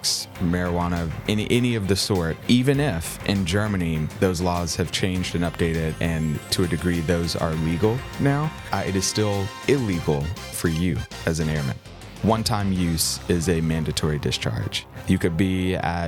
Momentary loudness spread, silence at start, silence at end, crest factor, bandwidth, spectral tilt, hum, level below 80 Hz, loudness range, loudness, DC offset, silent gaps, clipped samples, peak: 5 LU; 0 s; 0 s; 16 dB; 19 kHz; -5 dB/octave; none; -42 dBFS; 2 LU; -23 LUFS; under 0.1%; none; under 0.1%; -6 dBFS